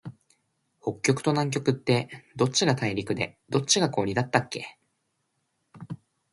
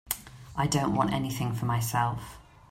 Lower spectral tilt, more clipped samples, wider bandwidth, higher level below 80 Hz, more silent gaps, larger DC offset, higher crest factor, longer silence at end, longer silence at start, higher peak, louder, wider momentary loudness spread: about the same, -4.5 dB/octave vs -5 dB/octave; neither; second, 11.5 kHz vs 16 kHz; second, -62 dBFS vs -52 dBFS; neither; neither; about the same, 24 dB vs 20 dB; about the same, 0.35 s vs 0.3 s; about the same, 0.05 s vs 0.05 s; first, -4 dBFS vs -10 dBFS; first, -26 LUFS vs -29 LUFS; first, 19 LU vs 12 LU